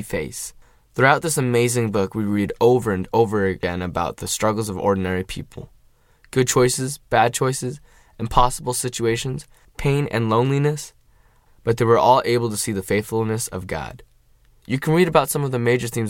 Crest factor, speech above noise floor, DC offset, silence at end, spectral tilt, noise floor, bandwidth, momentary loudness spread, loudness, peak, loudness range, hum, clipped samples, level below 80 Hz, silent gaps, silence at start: 20 dB; 35 dB; under 0.1%; 0 s; -5 dB/octave; -55 dBFS; 17 kHz; 14 LU; -20 LUFS; 0 dBFS; 3 LU; none; under 0.1%; -40 dBFS; none; 0 s